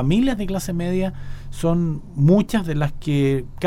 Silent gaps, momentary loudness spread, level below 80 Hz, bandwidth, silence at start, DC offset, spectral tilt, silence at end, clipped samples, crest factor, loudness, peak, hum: none; 9 LU; -34 dBFS; 15.5 kHz; 0 s; under 0.1%; -7.5 dB/octave; 0 s; under 0.1%; 16 dB; -21 LUFS; -4 dBFS; none